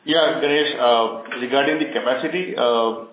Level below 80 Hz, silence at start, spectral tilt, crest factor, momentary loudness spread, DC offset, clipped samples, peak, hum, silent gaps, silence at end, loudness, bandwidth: -80 dBFS; 0.05 s; -8 dB/octave; 16 dB; 6 LU; under 0.1%; under 0.1%; -4 dBFS; none; none; 0.05 s; -19 LUFS; 4 kHz